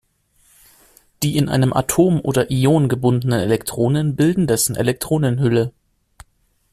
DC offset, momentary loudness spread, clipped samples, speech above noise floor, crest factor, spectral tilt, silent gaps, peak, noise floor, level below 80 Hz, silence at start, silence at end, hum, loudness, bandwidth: under 0.1%; 4 LU; under 0.1%; 44 dB; 16 dB; -6 dB/octave; none; -2 dBFS; -61 dBFS; -46 dBFS; 1.2 s; 1 s; none; -18 LUFS; 15 kHz